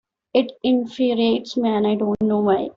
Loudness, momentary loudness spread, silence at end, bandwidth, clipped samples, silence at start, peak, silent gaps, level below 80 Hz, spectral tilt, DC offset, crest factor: -20 LUFS; 3 LU; 0.05 s; 7.2 kHz; under 0.1%; 0.35 s; -4 dBFS; none; -58 dBFS; -7 dB/octave; under 0.1%; 16 dB